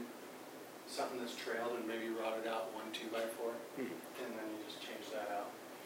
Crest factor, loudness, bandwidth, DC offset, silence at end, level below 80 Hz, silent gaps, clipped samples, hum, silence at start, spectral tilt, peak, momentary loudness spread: 16 dB; -43 LUFS; 16 kHz; under 0.1%; 0 s; under -90 dBFS; none; under 0.1%; none; 0 s; -3 dB/octave; -28 dBFS; 9 LU